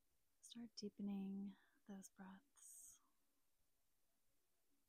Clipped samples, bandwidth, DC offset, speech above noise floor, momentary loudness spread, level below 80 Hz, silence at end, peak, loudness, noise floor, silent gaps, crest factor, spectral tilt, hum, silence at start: under 0.1%; 15.5 kHz; under 0.1%; 35 dB; 14 LU; under -90 dBFS; 1.9 s; -42 dBFS; -55 LUFS; -88 dBFS; none; 16 dB; -5.5 dB/octave; none; 0.45 s